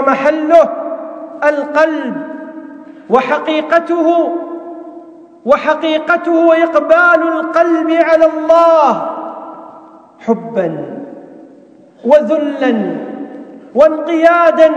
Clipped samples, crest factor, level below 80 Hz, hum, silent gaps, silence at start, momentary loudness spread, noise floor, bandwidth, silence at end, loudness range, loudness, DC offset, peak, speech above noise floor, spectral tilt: 0.6%; 12 dB; -58 dBFS; none; none; 0 s; 19 LU; -41 dBFS; 7.8 kHz; 0 s; 6 LU; -12 LUFS; under 0.1%; 0 dBFS; 31 dB; -6 dB/octave